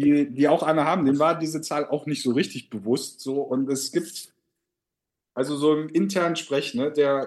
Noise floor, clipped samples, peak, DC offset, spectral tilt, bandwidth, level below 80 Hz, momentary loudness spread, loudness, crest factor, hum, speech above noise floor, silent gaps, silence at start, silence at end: -86 dBFS; under 0.1%; -6 dBFS; under 0.1%; -5 dB/octave; 12.5 kHz; -74 dBFS; 8 LU; -24 LUFS; 18 dB; none; 63 dB; none; 0 s; 0 s